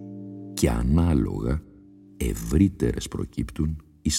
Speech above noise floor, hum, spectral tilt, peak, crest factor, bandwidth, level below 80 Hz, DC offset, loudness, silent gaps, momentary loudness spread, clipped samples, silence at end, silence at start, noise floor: 26 dB; 50 Hz at -45 dBFS; -6 dB/octave; -6 dBFS; 18 dB; 16.5 kHz; -32 dBFS; under 0.1%; -26 LUFS; none; 11 LU; under 0.1%; 0 s; 0 s; -50 dBFS